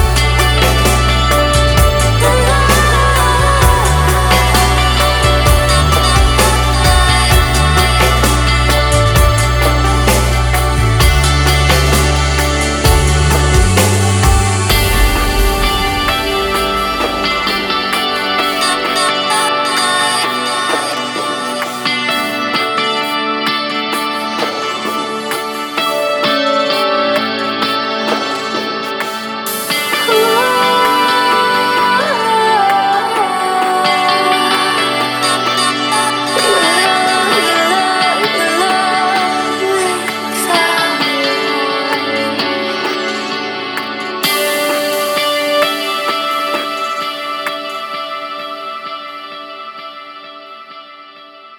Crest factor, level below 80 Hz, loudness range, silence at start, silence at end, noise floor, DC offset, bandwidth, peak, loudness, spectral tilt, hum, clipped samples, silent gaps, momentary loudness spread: 12 dB; -20 dBFS; 5 LU; 0 s; 0 s; -36 dBFS; under 0.1%; over 20 kHz; 0 dBFS; -12 LUFS; -3.5 dB/octave; none; under 0.1%; none; 8 LU